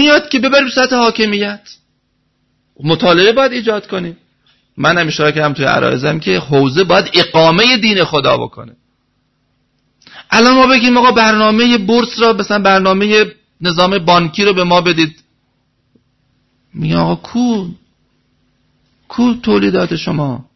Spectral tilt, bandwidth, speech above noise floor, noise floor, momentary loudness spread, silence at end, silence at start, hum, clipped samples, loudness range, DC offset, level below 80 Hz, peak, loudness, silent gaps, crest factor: -5 dB/octave; 6.2 kHz; 51 dB; -62 dBFS; 10 LU; 0.15 s; 0 s; none; under 0.1%; 8 LU; under 0.1%; -46 dBFS; 0 dBFS; -11 LUFS; none; 12 dB